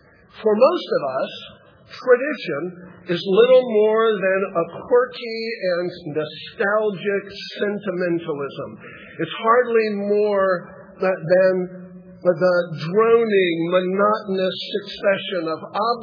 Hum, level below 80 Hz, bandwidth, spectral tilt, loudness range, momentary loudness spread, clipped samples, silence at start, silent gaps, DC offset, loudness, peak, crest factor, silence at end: none; -68 dBFS; 5.4 kHz; -7.5 dB/octave; 5 LU; 12 LU; under 0.1%; 0.35 s; none; under 0.1%; -20 LUFS; -2 dBFS; 18 dB; 0 s